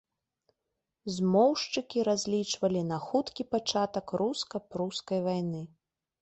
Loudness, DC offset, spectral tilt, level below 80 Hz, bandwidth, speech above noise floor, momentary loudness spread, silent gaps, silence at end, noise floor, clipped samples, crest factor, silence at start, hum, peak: -30 LUFS; under 0.1%; -5 dB/octave; -70 dBFS; 8.4 kHz; 55 dB; 11 LU; none; 0.55 s; -85 dBFS; under 0.1%; 18 dB; 1.05 s; none; -12 dBFS